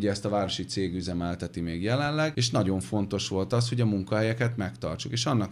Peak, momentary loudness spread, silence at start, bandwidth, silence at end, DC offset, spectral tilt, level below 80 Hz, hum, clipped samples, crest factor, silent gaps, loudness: -12 dBFS; 7 LU; 0 s; 12 kHz; 0 s; under 0.1%; -5.5 dB/octave; -54 dBFS; none; under 0.1%; 16 dB; none; -28 LUFS